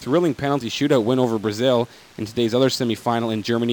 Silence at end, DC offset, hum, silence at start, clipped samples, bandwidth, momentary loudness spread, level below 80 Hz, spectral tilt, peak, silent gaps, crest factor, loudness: 0 s; under 0.1%; none; 0 s; under 0.1%; 19 kHz; 5 LU; -58 dBFS; -5.5 dB/octave; -6 dBFS; none; 14 dB; -21 LUFS